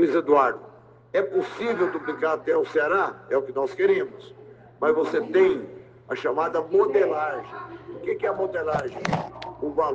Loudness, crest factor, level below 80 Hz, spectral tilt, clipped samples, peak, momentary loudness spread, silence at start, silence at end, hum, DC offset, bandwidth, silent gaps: -24 LUFS; 18 dB; -62 dBFS; -6.5 dB/octave; under 0.1%; -6 dBFS; 14 LU; 0 s; 0 s; none; under 0.1%; 7.6 kHz; none